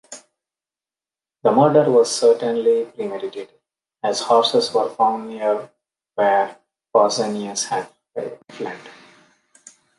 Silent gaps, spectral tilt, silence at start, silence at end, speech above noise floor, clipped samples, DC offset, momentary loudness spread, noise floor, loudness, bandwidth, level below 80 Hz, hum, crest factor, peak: none; -4 dB/octave; 0.1 s; 1.05 s; over 71 dB; under 0.1%; under 0.1%; 17 LU; under -90 dBFS; -19 LUFS; 11.5 kHz; -72 dBFS; none; 18 dB; -2 dBFS